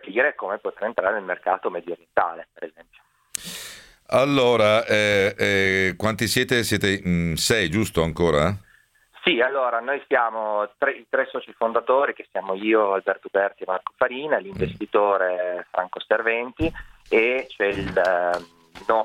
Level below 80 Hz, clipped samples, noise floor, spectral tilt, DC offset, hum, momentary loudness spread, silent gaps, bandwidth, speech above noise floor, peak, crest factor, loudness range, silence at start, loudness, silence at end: -50 dBFS; under 0.1%; -58 dBFS; -4.5 dB/octave; under 0.1%; none; 10 LU; none; 17 kHz; 36 dB; 0 dBFS; 22 dB; 5 LU; 0.05 s; -22 LUFS; 0 s